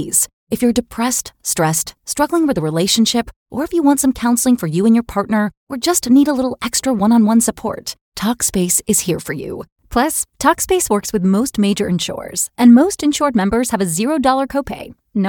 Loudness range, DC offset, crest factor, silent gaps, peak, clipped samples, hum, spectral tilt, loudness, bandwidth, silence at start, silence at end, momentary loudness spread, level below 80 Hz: 2 LU; under 0.1%; 16 dB; 0.33-0.47 s, 3.36-3.46 s, 5.57-5.67 s, 8.01-8.12 s, 9.72-9.76 s; 0 dBFS; under 0.1%; none; -4 dB/octave; -16 LUFS; 19.5 kHz; 0 s; 0 s; 10 LU; -42 dBFS